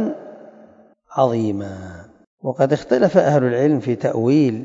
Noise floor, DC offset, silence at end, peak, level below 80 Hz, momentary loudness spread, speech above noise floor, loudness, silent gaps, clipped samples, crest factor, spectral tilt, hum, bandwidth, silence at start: -49 dBFS; under 0.1%; 0 s; -2 dBFS; -60 dBFS; 16 LU; 32 dB; -18 LUFS; 2.27-2.38 s; under 0.1%; 18 dB; -8 dB/octave; none; 7.8 kHz; 0 s